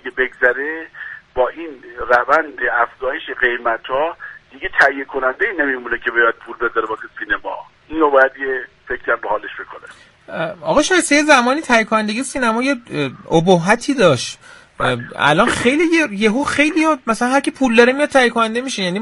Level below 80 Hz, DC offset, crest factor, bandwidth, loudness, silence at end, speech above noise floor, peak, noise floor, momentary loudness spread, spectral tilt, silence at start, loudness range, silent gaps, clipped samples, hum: -48 dBFS; under 0.1%; 18 dB; 11.5 kHz; -16 LUFS; 0 s; 26 dB; 0 dBFS; -42 dBFS; 14 LU; -4 dB/octave; 0.05 s; 4 LU; none; under 0.1%; none